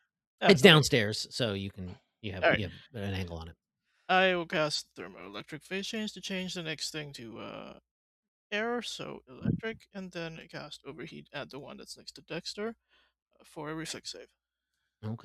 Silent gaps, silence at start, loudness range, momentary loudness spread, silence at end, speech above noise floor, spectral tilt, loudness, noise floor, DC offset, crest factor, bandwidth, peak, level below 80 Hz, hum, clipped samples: 7.91-8.50 s, 13.22-13.26 s; 0.4 s; 14 LU; 20 LU; 0.05 s; 53 dB; -4.5 dB/octave; -30 LUFS; -84 dBFS; under 0.1%; 30 dB; 14 kHz; -2 dBFS; -64 dBFS; none; under 0.1%